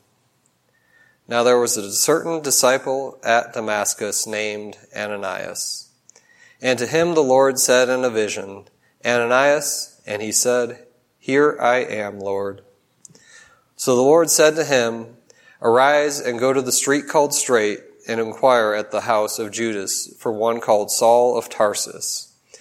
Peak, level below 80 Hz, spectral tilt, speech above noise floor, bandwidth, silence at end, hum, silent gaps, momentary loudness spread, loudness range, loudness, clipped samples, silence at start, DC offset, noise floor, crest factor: 0 dBFS; -70 dBFS; -2.5 dB/octave; 45 dB; 16.5 kHz; 0.35 s; none; none; 12 LU; 5 LU; -19 LUFS; under 0.1%; 1.3 s; under 0.1%; -64 dBFS; 20 dB